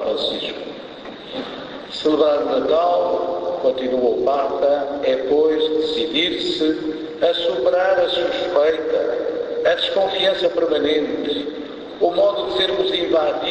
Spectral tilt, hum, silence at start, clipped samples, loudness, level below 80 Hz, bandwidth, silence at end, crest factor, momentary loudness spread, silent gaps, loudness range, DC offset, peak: -4.5 dB/octave; none; 0 s; under 0.1%; -19 LUFS; -54 dBFS; 8 kHz; 0 s; 16 dB; 12 LU; none; 2 LU; under 0.1%; -4 dBFS